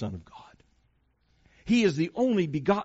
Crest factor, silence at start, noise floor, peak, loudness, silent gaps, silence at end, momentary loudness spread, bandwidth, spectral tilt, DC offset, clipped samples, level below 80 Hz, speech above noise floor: 20 dB; 0 s; -69 dBFS; -10 dBFS; -26 LUFS; none; 0 s; 18 LU; 8 kHz; -5.5 dB/octave; under 0.1%; under 0.1%; -58 dBFS; 43 dB